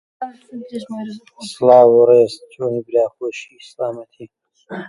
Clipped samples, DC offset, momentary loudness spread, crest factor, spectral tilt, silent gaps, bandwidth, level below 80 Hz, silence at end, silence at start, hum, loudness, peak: under 0.1%; under 0.1%; 23 LU; 18 dB; -6 dB/octave; none; 11.5 kHz; -68 dBFS; 0 s; 0.2 s; none; -14 LUFS; 0 dBFS